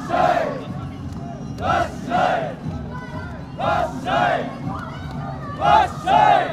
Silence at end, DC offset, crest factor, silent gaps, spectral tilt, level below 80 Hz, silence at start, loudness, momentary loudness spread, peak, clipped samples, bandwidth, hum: 0 s; under 0.1%; 18 dB; none; -6 dB/octave; -42 dBFS; 0 s; -21 LUFS; 15 LU; -2 dBFS; under 0.1%; 13 kHz; none